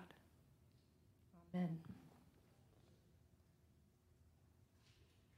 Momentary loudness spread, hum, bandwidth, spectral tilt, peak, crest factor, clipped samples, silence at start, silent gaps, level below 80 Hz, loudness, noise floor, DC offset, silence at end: 23 LU; none; 15 kHz; -8.5 dB/octave; -34 dBFS; 20 dB; under 0.1%; 0 s; none; -80 dBFS; -47 LUFS; -73 dBFS; under 0.1%; 0.35 s